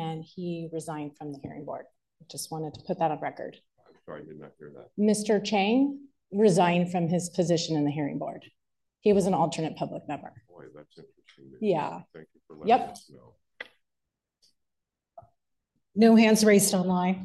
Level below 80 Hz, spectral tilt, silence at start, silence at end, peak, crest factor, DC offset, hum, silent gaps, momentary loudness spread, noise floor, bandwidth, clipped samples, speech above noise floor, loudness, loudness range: -68 dBFS; -5 dB/octave; 0 s; 0 s; -8 dBFS; 20 dB; under 0.1%; none; none; 23 LU; -85 dBFS; 12.5 kHz; under 0.1%; 58 dB; -26 LUFS; 10 LU